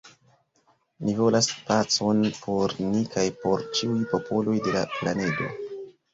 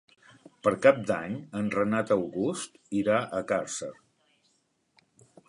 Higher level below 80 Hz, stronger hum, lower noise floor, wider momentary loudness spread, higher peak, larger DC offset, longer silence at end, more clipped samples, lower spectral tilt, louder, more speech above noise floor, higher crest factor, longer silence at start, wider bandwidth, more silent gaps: first, -60 dBFS vs -66 dBFS; neither; second, -66 dBFS vs -72 dBFS; second, 8 LU vs 13 LU; about the same, -8 dBFS vs -6 dBFS; neither; second, 0.25 s vs 1.55 s; neither; about the same, -4.5 dB/octave vs -5 dB/octave; first, -25 LUFS vs -28 LUFS; second, 41 dB vs 45 dB; about the same, 18 dB vs 22 dB; second, 0.05 s vs 0.65 s; second, 8 kHz vs 11.5 kHz; neither